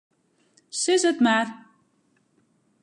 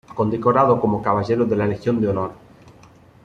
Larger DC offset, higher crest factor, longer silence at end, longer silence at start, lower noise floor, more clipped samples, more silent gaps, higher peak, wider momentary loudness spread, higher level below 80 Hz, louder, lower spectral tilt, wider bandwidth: neither; about the same, 16 dB vs 18 dB; first, 1.25 s vs 0.9 s; first, 0.75 s vs 0.1 s; first, -67 dBFS vs -48 dBFS; neither; neither; second, -10 dBFS vs -2 dBFS; first, 13 LU vs 7 LU; second, -80 dBFS vs -50 dBFS; about the same, -22 LUFS vs -20 LUFS; second, -2.5 dB/octave vs -9 dB/octave; first, 11.5 kHz vs 7.4 kHz